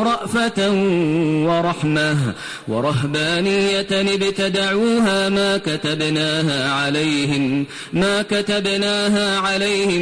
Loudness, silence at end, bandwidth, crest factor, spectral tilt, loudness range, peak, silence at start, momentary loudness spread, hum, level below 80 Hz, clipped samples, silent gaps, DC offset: -18 LUFS; 0 s; 10.5 kHz; 10 dB; -5 dB/octave; 1 LU; -8 dBFS; 0 s; 3 LU; none; -50 dBFS; under 0.1%; none; under 0.1%